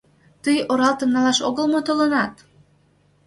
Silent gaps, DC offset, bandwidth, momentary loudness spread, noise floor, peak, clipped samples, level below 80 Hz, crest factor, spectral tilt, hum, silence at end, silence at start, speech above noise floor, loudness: none; under 0.1%; 11.5 kHz; 5 LU; -59 dBFS; -4 dBFS; under 0.1%; -62 dBFS; 16 dB; -3.5 dB/octave; none; 0.95 s; 0.45 s; 40 dB; -20 LUFS